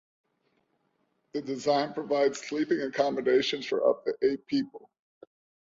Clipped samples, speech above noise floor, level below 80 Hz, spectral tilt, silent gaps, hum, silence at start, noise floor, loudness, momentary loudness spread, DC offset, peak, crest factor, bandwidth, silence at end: under 0.1%; 46 dB; -72 dBFS; -4.5 dB/octave; none; none; 1.35 s; -74 dBFS; -28 LUFS; 8 LU; under 0.1%; -12 dBFS; 18 dB; 7.8 kHz; 0.9 s